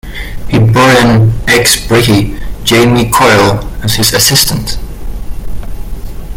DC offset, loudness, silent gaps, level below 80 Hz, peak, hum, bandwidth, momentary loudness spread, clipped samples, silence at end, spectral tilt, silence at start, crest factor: under 0.1%; -8 LUFS; none; -22 dBFS; 0 dBFS; none; 17.5 kHz; 20 LU; 0.2%; 0 s; -4 dB/octave; 0.05 s; 10 dB